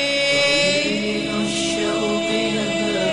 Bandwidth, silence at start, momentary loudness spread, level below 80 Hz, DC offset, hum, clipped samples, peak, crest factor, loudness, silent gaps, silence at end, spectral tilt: 10.5 kHz; 0 s; 6 LU; -50 dBFS; 0.2%; none; under 0.1%; -10 dBFS; 10 dB; -19 LUFS; none; 0 s; -3 dB/octave